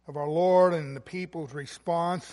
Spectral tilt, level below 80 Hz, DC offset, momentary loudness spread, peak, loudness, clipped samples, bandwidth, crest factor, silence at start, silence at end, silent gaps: -6.5 dB/octave; -68 dBFS; under 0.1%; 15 LU; -10 dBFS; -27 LUFS; under 0.1%; 11.5 kHz; 16 dB; 0.1 s; 0 s; none